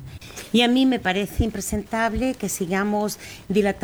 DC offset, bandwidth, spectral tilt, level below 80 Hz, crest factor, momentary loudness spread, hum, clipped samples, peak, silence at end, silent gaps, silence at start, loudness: under 0.1%; over 20 kHz; -4.5 dB/octave; -38 dBFS; 16 dB; 10 LU; none; under 0.1%; -6 dBFS; 0 s; none; 0 s; -22 LUFS